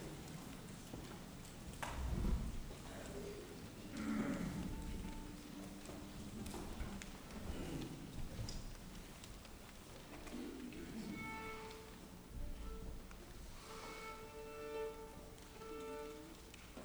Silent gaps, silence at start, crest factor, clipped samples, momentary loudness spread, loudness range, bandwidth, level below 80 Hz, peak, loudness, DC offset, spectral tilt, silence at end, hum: none; 0 s; 20 dB; under 0.1%; 11 LU; 5 LU; over 20 kHz; -52 dBFS; -28 dBFS; -49 LUFS; under 0.1%; -5 dB/octave; 0 s; none